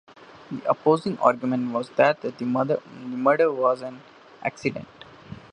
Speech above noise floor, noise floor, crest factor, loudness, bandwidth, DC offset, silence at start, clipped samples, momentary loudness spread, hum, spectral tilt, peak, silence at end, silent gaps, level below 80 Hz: 20 dB; -43 dBFS; 22 dB; -24 LUFS; 10 kHz; under 0.1%; 0.35 s; under 0.1%; 17 LU; none; -7 dB/octave; -4 dBFS; 0.15 s; none; -66 dBFS